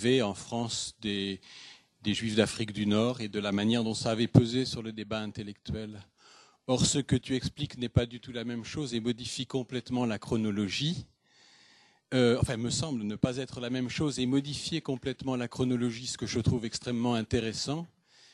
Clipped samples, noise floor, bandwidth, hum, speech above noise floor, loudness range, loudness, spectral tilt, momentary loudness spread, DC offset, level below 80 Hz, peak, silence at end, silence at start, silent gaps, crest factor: under 0.1%; -62 dBFS; 11.5 kHz; none; 32 dB; 4 LU; -31 LUFS; -5 dB/octave; 11 LU; under 0.1%; -54 dBFS; -4 dBFS; 0.45 s; 0 s; none; 26 dB